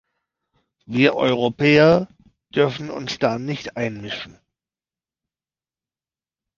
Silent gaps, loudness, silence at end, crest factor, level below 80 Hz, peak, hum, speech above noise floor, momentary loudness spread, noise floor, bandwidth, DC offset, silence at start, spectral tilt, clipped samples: none; -20 LUFS; 2.25 s; 20 dB; -56 dBFS; -2 dBFS; none; over 71 dB; 16 LU; under -90 dBFS; 7.4 kHz; under 0.1%; 0.9 s; -6.5 dB/octave; under 0.1%